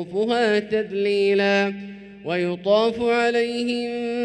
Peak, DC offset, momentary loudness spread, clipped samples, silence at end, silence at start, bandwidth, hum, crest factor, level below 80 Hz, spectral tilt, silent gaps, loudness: -8 dBFS; under 0.1%; 8 LU; under 0.1%; 0 s; 0 s; 9.6 kHz; none; 14 dB; -60 dBFS; -5.5 dB/octave; none; -21 LUFS